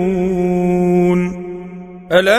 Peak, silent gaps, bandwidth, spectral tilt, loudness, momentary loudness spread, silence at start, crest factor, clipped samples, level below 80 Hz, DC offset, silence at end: 0 dBFS; none; 15 kHz; -7 dB/octave; -15 LUFS; 17 LU; 0 s; 16 dB; under 0.1%; -42 dBFS; under 0.1%; 0 s